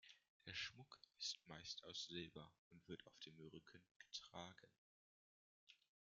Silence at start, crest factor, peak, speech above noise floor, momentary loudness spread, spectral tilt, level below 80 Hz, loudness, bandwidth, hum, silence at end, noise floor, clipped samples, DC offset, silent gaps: 0.05 s; 22 dB; -36 dBFS; over 33 dB; 15 LU; -1.5 dB/octave; -86 dBFS; -54 LUFS; 7.4 kHz; none; 0.35 s; under -90 dBFS; under 0.1%; under 0.1%; 0.29-0.40 s, 2.58-2.71 s, 3.91-4.00 s, 4.78-5.67 s